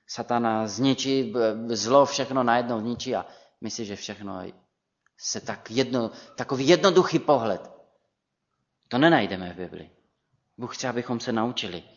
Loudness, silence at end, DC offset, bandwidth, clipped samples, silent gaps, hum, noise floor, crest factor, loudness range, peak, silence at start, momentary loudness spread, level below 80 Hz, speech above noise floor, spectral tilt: -25 LUFS; 0.15 s; under 0.1%; 7.4 kHz; under 0.1%; none; none; -79 dBFS; 22 dB; 8 LU; -4 dBFS; 0.1 s; 16 LU; -68 dBFS; 55 dB; -4.5 dB/octave